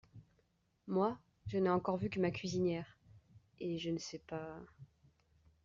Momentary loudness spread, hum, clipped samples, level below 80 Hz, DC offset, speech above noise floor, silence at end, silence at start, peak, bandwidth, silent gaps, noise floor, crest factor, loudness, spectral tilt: 17 LU; none; under 0.1%; -70 dBFS; under 0.1%; 40 dB; 0.8 s; 0.15 s; -22 dBFS; 7.4 kHz; none; -77 dBFS; 18 dB; -38 LUFS; -6 dB/octave